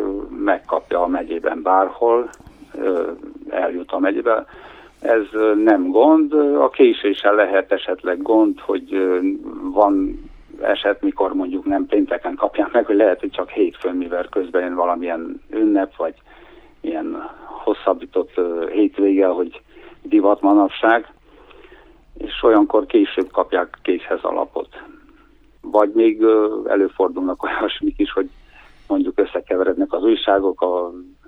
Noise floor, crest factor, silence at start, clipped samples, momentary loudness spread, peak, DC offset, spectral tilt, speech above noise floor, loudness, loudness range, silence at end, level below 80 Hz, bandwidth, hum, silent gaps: -50 dBFS; 18 dB; 0 s; under 0.1%; 12 LU; 0 dBFS; under 0.1%; -6 dB/octave; 33 dB; -18 LUFS; 6 LU; 0.25 s; -48 dBFS; 4.3 kHz; none; none